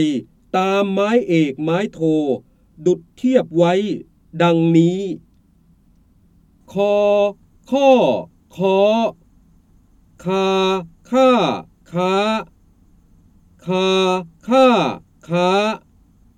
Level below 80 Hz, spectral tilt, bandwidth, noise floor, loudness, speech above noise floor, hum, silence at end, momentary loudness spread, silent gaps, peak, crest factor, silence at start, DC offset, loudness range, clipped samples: -56 dBFS; -6.5 dB/octave; 13 kHz; -54 dBFS; -18 LUFS; 38 dB; none; 0.6 s; 13 LU; none; -2 dBFS; 16 dB; 0 s; under 0.1%; 3 LU; under 0.1%